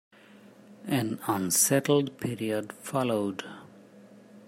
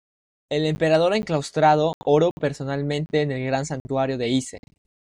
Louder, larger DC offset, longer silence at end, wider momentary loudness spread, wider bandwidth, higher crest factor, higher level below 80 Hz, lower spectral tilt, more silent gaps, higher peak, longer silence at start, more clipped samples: second, -27 LUFS vs -22 LUFS; neither; second, 0.05 s vs 0.5 s; first, 18 LU vs 8 LU; first, 16 kHz vs 11 kHz; about the same, 20 dB vs 16 dB; second, -72 dBFS vs -54 dBFS; second, -4 dB/octave vs -6 dB/octave; second, none vs 1.94-2.01 s, 2.31-2.37 s, 3.80-3.85 s; second, -10 dBFS vs -6 dBFS; first, 0.7 s vs 0.5 s; neither